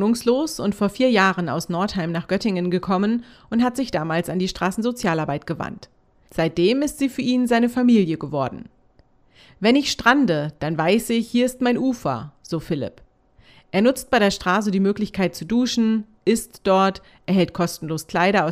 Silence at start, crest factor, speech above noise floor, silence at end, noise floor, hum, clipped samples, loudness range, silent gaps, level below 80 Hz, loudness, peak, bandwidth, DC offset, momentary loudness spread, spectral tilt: 0 s; 18 dB; 36 dB; 0 s; -56 dBFS; none; under 0.1%; 3 LU; none; -50 dBFS; -21 LUFS; -2 dBFS; 15.5 kHz; under 0.1%; 10 LU; -5.5 dB/octave